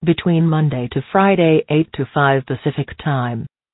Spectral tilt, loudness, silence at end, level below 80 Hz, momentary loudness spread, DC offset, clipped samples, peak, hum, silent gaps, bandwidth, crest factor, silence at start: -12.5 dB/octave; -17 LUFS; 0.25 s; -48 dBFS; 9 LU; under 0.1%; under 0.1%; 0 dBFS; none; none; 4.1 kHz; 16 dB; 0 s